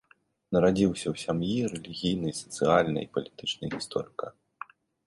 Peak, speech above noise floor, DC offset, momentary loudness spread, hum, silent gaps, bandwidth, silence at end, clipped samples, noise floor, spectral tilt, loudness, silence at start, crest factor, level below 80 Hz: -8 dBFS; 20 dB; under 0.1%; 17 LU; none; none; 11.5 kHz; 0.75 s; under 0.1%; -48 dBFS; -5.5 dB/octave; -29 LUFS; 0.5 s; 22 dB; -56 dBFS